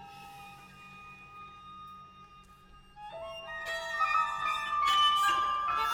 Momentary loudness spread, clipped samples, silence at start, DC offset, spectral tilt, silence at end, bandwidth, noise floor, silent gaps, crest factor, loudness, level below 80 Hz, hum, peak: 24 LU; under 0.1%; 0 s; under 0.1%; -0.5 dB/octave; 0 s; 18 kHz; -56 dBFS; none; 18 dB; -29 LUFS; -62 dBFS; none; -16 dBFS